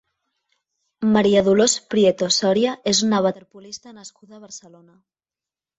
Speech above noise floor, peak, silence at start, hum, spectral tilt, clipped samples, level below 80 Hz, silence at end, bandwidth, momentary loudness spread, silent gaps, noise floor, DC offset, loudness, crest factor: over 70 dB; -4 dBFS; 1 s; none; -4 dB/octave; under 0.1%; -58 dBFS; 1.2 s; 8.2 kHz; 22 LU; none; under -90 dBFS; under 0.1%; -18 LUFS; 18 dB